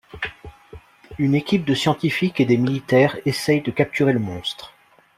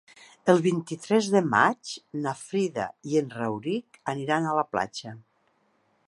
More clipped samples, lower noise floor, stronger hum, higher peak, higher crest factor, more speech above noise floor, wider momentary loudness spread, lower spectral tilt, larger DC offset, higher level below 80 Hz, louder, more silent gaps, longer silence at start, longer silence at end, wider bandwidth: neither; second, -45 dBFS vs -69 dBFS; neither; about the same, -4 dBFS vs -4 dBFS; about the same, 18 dB vs 22 dB; second, 25 dB vs 42 dB; about the same, 13 LU vs 11 LU; about the same, -6 dB/octave vs -5.5 dB/octave; neither; first, -52 dBFS vs -70 dBFS; first, -20 LUFS vs -26 LUFS; neither; second, 0.15 s vs 0.45 s; second, 0.5 s vs 0.9 s; first, 15.5 kHz vs 11.5 kHz